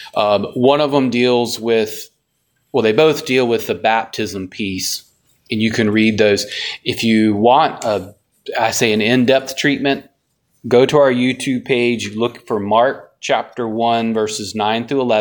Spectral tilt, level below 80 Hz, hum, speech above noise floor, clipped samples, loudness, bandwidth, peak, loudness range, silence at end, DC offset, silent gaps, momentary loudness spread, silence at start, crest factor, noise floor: -4.5 dB/octave; -58 dBFS; none; 51 dB; under 0.1%; -16 LUFS; 19.5 kHz; 0 dBFS; 2 LU; 0 s; under 0.1%; none; 10 LU; 0 s; 16 dB; -66 dBFS